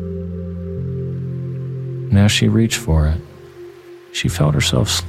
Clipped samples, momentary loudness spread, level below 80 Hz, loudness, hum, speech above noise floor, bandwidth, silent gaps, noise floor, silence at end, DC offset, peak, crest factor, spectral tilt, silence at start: under 0.1%; 19 LU; -30 dBFS; -19 LUFS; none; 23 dB; 15.5 kHz; none; -39 dBFS; 0 s; under 0.1%; -2 dBFS; 16 dB; -5 dB/octave; 0 s